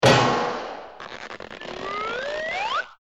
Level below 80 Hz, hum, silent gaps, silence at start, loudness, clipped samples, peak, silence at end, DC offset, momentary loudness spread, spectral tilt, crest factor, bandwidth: -52 dBFS; none; none; 0 s; -25 LUFS; under 0.1%; -4 dBFS; 0.1 s; 0.1%; 17 LU; -4.5 dB/octave; 20 dB; 14 kHz